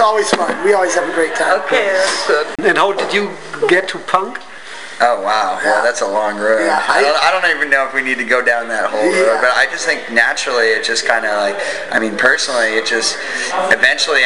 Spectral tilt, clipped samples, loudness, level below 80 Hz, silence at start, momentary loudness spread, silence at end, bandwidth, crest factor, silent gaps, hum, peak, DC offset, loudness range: -1.5 dB/octave; under 0.1%; -14 LUFS; -60 dBFS; 0 s; 5 LU; 0 s; 12 kHz; 14 dB; none; none; 0 dBFS; 1%; 3 LU